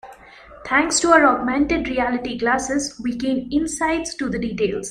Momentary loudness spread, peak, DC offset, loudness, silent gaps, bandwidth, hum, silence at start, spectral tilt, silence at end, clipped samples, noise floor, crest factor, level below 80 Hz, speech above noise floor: 11 LU; 0 dBFS; under 0.1%; -20 LUFS; none; 14.5 kHz; none; 0.05 s; -3 dB/octave; 0 s; under 0.1%; -44 dBFS; 20 dB; -44 dBFS; 24 dB